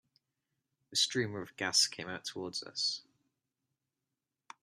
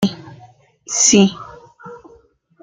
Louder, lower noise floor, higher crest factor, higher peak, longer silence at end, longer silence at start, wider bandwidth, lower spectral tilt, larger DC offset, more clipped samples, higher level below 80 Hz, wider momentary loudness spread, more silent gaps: second, -33 LUFS vs -14 LUFS; first, -89 dBFS vs -51 dBFS; about the same, 22 dB vs 18 dB; second, -16 dBFS vs -2 dBFS; first, 1.6 s vs 0.65 s; first, 0.9 s vs 0 s; first, 14 kHz vs 10 kHz; second, -1.5 dB/octave vs -3.5 dB/octave; neither; neither; second, -80 dBFS vs -56 dBFS; second, 12 LU vs 27 LU; neither